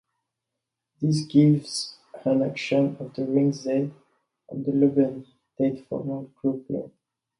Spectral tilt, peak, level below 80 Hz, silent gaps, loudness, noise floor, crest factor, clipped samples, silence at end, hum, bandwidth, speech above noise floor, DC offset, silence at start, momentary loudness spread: -7 dB/octave; -8 dBFS; -68 dBFS; none; -25 LUFS; -84 dBFS; 18 dB; under 0.1%; 0.55 s; none; 11.5 kHz; 61 dB; under 0.1%; 1 s; 13 LU